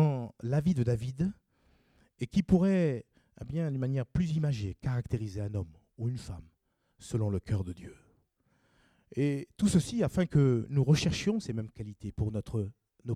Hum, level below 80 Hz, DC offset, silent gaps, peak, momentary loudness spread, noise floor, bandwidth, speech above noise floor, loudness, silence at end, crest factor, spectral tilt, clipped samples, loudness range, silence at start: none; -52 dBFS; under 0.1%; none; -12 dBFS; 15 LU; -74 dBFS; 12.5 kHz; 43 dB; -31 LUFS; 0 s; 20 dB; -7 dB/octave; under 0.1%; 8 LU; 0 s